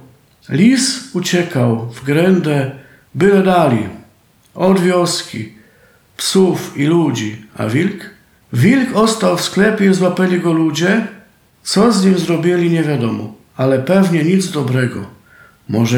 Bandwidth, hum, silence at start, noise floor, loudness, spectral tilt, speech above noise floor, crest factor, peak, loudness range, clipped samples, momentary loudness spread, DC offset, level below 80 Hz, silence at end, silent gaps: 17 kHz; none; 0.5 s; -51 dBFS; -14 LUFS; -5.5 dB/octave; 37 dB; 14 dB; -2 dBFS; 3 LU; under 0.1%; 12 LU; under 0.1%; -54 dBFS; 0 s; none